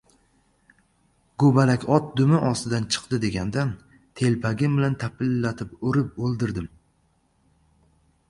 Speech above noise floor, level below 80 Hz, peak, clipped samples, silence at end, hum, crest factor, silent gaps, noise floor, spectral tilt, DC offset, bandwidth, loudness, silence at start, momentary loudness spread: 43 dB; -52 dBFS; -4 dBFS; under 0.1%; 1.6 s; none; 20 dB; none; -66 dBFS; -6.5 dB/octave; under 0.1%; 11.5 kHz; -23 LUFS; 1.4 s; 10 LU